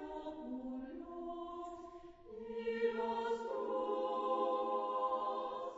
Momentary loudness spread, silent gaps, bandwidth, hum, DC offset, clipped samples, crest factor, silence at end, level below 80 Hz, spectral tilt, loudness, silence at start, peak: 13 LU; none; 7.6 kHz; none; under 0.1%; under 0.1%; 16 dB; 0 s; -70 dBFS; -2.5 dB/octave; -40 LUFS; 0 s; -24 dBFS